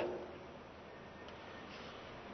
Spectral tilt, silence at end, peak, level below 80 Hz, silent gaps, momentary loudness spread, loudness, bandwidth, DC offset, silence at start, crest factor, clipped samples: -3.5 dB/octave; 0 s; -28 dBFS; -68 dBFS; none; 6 LU; -50 LUFS; 6.2 kHz; under 0.1%; 0 s; 20 dB; under 0.1%